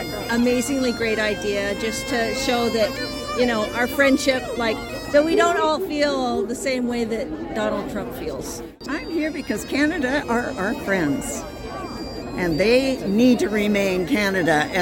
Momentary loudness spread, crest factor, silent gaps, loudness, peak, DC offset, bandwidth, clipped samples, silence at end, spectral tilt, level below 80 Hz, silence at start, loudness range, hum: 11 LU; 18 dB; none; -22 LUFS; -4 dBFS; under 0.1%; 17 kHz; under 0.1%; 0 s; -4.5 dB/octave; -44 dBFS; 0 s; 5 LU; none